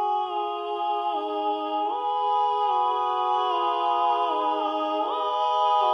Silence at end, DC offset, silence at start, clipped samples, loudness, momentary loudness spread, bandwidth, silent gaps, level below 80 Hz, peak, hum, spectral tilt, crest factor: 0 s; under 0.1%; 0 s; under 0.1%; -25 LUFS; 4 LU; 6.2 kHz; none; -84 dBFS; -12 dBFS; none; -3 dB/octave; 12 dB